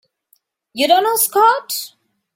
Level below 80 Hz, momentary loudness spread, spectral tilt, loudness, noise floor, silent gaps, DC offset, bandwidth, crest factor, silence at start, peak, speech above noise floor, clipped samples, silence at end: -68 dBFS; 17 LU; 0 dB/octave; -15 LUFS; -61 dBFS; none; under 0.1%; 16.5 kHz; 16 dB; 0.75 s; -2 dBFS; 46 dB; under 0.1%; 0.5 s